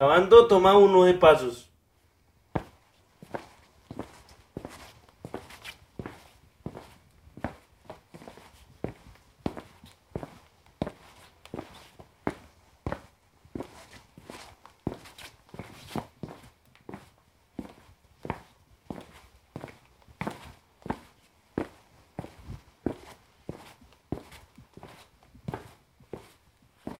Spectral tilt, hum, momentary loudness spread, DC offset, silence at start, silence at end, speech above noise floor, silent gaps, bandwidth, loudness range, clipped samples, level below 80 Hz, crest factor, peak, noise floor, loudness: -6 dB/octave; none; 29 LU; under 0.1%; 0 s; 0.1 s; 48 dB; none; 14.5 kHz; 17 LU; under 0.1%; -56 dBFS; 26 dB; -4 dBFS; -66 dBFS; -24 LUFS